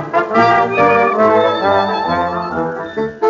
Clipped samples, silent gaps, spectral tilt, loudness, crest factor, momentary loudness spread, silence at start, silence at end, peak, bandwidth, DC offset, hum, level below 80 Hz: under 0.1%; none; -3.5 dB/octave; -14 LUFS; 14 dB; 9 LU; 0 s; 0 s; 0 dBFS; 7.4 kHz; under 0.1%; none; -52 dBFS